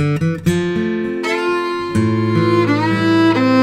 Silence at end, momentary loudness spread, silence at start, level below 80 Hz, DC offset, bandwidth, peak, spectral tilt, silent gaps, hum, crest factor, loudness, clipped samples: 0 s; 6 LU; 0 s; -48 dBFS; under 0.1%; 13.5 kHz; -2 dBFS; -7 dB/octave; none; none; 12 dB; -16 LUFS; under 0.1%